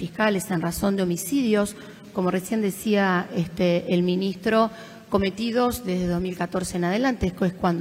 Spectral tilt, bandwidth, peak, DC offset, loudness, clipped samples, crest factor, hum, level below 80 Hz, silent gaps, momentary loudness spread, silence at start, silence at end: -5.5 dB/octave; 16 kHz; -8 dBFS; under 0.1%; -24 LUFS; under 0.1%; 16 dB; none; -48 dBFS; none; 5 LU; 0 s; 0 s